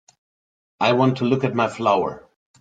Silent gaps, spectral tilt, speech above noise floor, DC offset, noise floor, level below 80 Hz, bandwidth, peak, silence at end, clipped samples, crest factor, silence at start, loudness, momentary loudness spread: none; -7 dB/octave; over 71 dB; under 0.1%; under -90 dBFS; -62 dBFS; 9.2 kHz; -4 dBFS; 0.4 s; under 0.1%; 18 dB; 0.8 s; -20 LUFS; 5 LU